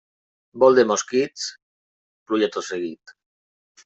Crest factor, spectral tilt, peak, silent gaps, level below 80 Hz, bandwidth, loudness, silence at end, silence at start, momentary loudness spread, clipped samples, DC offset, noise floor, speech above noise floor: 20 dB; -3.5 dB/octave; -4 dBFS; 1.62-2.26 s; -68 dBFS; 8.2 kHz; -21 LUFS; 0.9 s; 0.55 s; 15 LU; under 0.1%; under 0.1%; under -90 dBFS; over 70 dB